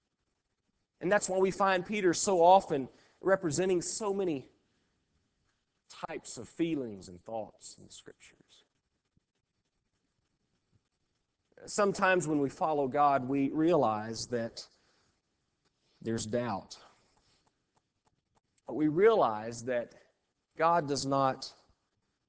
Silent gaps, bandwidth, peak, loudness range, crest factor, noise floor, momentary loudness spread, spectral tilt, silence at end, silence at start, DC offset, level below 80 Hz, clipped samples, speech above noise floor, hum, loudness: none; 8 kHz; -12 dBFS; 12 LU; 22 dB; -82 dBFS; 20 LU; -4.5 dB/octave; 0.8 s; 1 s; under 0.1%; -68 dBFS; under 0.1%; 52 dB; none; -30 LUFS